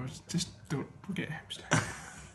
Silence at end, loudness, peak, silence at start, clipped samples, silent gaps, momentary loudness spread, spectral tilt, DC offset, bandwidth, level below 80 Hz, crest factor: 0 s; -36 LUFS; -8 dBFS; 0 s; under 0.1%; none; 10 LU; -4 dB/octave; under 0.1%; 12.5 kHz; -60 dBFS; 28 dB